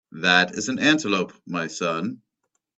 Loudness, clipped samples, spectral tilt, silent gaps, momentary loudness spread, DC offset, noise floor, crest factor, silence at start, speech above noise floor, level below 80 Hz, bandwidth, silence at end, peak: -22 LUFS; under 0.1%; -3.5 dB/octave; none; 11 LU; under 0.1%; -77 dBFS; 24 dB; 0.15 s; 54 dB; -64 dBFS; 8.4 kHz; 0.6 s; 0 dBFS